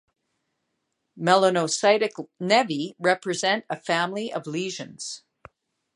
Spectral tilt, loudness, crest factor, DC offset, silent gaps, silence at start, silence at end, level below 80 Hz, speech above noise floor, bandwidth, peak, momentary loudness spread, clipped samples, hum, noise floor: -3.5 dB/octave; -24 LUFS; 22 dB; under 0.1%; none; 1.15 s; 0.8 s; -74 dBFS; 54 dB; 11 kHz; -4 dBFS; 14 LU; under 0.1%; none; -78 dBFS